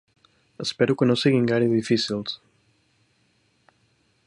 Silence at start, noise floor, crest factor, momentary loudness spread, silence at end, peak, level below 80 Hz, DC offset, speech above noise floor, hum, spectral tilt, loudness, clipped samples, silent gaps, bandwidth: 0.6 s; -66 dBFS; 20 dB; 11 LU; 1.9 s; -6 dBFS; -64 dBFS; under 0.1%; 44 dB; none; -6 dB/octave; -22 LUFS; under 0.1%; none; 11 kHz